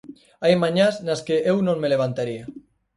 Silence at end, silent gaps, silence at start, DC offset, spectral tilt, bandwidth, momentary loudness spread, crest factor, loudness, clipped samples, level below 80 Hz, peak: 0.4 s; none; 0.05 s; under 0.1%; -6 dB/octave; 11.5 kHz; 10 LU; 18 dB; -21 LUFS; under 0.1%; -62 dBFS; -4 dBFS